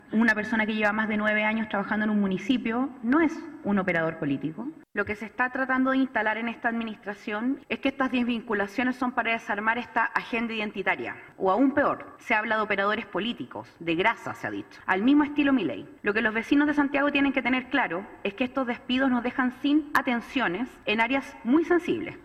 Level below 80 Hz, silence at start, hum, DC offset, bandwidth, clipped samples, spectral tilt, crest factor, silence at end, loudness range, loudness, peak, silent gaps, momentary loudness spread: -60 dBFS; 0.1 s; none; under 0.1%; 13.5 kHz; under 0.1%; -6 dB/octave; 18 dB; 0.05 s; 3 LU; -26 LUFS; -8 dBFS; none; 9 LU